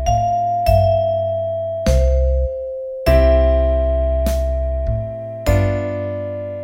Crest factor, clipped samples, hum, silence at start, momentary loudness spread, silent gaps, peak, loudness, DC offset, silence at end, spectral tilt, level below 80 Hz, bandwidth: 16 dB; under 0.1%; none; 0 s; 10 LU; none; -2 dBFS; -18 LUFS; under 0.1%; 0 s; -7 dB/octave; -20 dBFS; 16 kHz